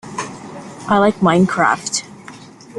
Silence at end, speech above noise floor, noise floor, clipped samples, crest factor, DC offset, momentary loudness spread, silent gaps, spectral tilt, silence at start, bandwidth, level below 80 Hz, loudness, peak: 0 s; 24 dB; -38 dBFS; under 0.1%; 16 dB; under 0.1%; 22 LU; none; -5 dB/octave; 0.05 s; 11.5 kHz; -54 dBFS; -16 LUFS; -2 dBFS